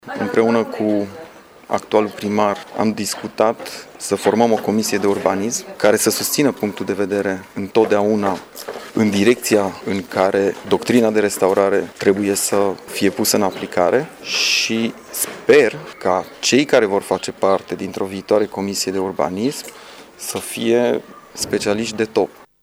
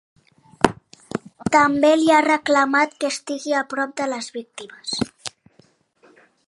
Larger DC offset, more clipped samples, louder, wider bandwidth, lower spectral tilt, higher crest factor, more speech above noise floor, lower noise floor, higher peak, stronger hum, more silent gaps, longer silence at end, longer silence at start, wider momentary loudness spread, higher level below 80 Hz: neither; neither; about the same, -18 LUFS vs -20 LUFS; first, over 20 kHz vs 11.5 kHz; about the same, -4 dB/octave vs -4 dB/octave; about the same, 18 dB vs 22 dB; second, 22 dB vs 38 dB; second, -40 dBFS vs -58 dBFS; about the same, 0 dBFS vs 0 dBFS; neither; neither; second, 0.35 s vs 1.2 s; second, 0.05 s vs 0.65 s; second, 10 LU vs 17 LU; second, -60 dBFS vs -54 dBFS